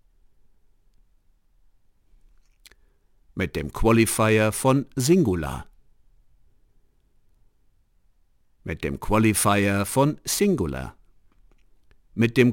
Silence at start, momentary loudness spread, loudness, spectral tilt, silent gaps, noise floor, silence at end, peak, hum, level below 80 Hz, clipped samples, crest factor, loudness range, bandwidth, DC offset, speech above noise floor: 3.35 s; 16 LU; -22 LUFS; -5 dB/octave; none; -61 dBFS; 0 s; -4 dBFS; none; -42 dBFS; under 0.1%; 22 dB; 14 LU; 17 kHz; under 0.1%; 40 dB